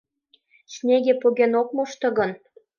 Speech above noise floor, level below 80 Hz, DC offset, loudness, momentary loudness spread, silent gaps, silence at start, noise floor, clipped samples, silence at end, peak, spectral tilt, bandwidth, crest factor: 42 dB; -72 dBFS; under 0.1%; -22 LUFS; 11 LU; none; 0.7 s; -63 dBFS; under 0.1%; 0.45 s; -6 dBFS; -5 dB/octave; 7.2 kHz; 16 dB